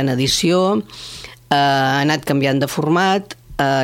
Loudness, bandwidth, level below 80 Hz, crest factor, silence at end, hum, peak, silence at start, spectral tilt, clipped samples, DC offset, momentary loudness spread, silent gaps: -17 LUFS; 17 kHz; -46 dBFS; 16 dB; 0 s; none; -2 dBFS; 0 s; -4.5 dB/octave; under 0.1%; under 0.1%; 16 LU; none